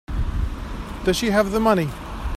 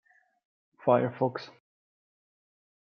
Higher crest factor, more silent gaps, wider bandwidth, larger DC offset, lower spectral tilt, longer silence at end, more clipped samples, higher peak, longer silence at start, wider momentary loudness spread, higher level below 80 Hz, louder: second, 18 dB vs 24 dB; neither; first, 15.5 kHz vs 6.4 kHz; neither; second, -5.5 dB/octave vs -8.5 dB/octave; second, 0 s vs 1.35 s; neither; first, -4 dBFS vs -10 dBFS; second, 0.1 s vs 0.85 s; second, 13 LU vs 17 LU; first, -30 dBFS vs -82 dBFS; first, -22 LUFS vs -28 LUFS